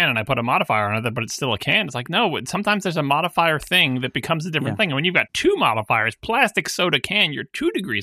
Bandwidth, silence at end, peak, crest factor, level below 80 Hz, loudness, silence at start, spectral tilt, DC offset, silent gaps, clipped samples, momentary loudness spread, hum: 15.5 kHz; 0 s; -2 dBFS; 18 dB; -52 dBFS; -20 LUFS; 0 s; -4 dB/octave; under 0.1%; none; under 0.1%; 6 LU; none